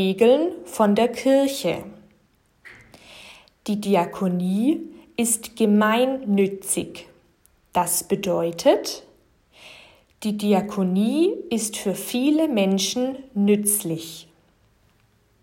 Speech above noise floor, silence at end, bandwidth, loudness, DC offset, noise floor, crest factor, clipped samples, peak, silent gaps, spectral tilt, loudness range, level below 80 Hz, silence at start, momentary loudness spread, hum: 41 dB; 1.2 s; 16.5 kHz; -22 LUFS; under 0.1%; -62 dBFS; 18 dB; under 0.1%; -4 dBFS; none; -4.5 dB/octave; 4 LU; -62 dBFS; 0 s; 13 LU; none